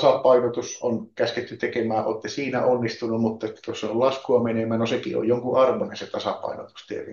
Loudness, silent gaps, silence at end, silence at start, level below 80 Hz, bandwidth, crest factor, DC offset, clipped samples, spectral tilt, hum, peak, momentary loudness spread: -24 LUFS; none; 0 s; 0 s; -70 dBFS; 7.2 kHz; 18 dB; under 0.1%; under 0.1%; -5.5 dB/octave; none; -6 dBFS; 11 LU